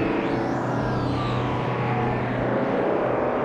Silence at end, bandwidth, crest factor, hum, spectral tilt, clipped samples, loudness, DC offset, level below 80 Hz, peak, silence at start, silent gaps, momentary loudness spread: 0 s; 8.6 kHz; 12 dB; none; -8 dB/octave; under 0.1%; -24 LUFS; under 0.1%; -44 dBFS; -10 dBFS; 0 s; none; 2 LU